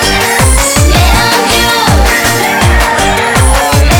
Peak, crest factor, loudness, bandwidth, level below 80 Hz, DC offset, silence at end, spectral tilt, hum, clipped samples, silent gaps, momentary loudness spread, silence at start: 0 dBFS; 6 dB; -7 LUFS; over 20 kHz; -14 dBFS; 1%; 0 s; -3.5 dB/octave; none; under 0.1%; none; 2 LU; 0 s